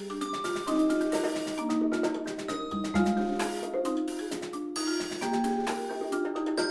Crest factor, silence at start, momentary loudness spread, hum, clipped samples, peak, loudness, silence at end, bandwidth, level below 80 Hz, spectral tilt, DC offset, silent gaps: 14 dB; 0 s; 7 LU; none; under 0.1%; -16 dBFS; -30 LUFS; 0 s; 12 kHz; -58 dBFS; -4.5 dB/octave; under 0.1%; none